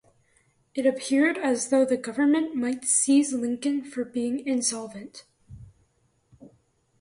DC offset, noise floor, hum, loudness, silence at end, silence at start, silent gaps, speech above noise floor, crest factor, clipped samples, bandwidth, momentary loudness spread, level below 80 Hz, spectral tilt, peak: under 0.1%; -68 dBFS; none; -25 LUFS; 0.55 s; 0.75 s; none; 43 dB; 16 dB; under 0.1%; 11.5 kHz; 12 LU; -64 dBFS; -2.5 dB/octave; -10 dBFS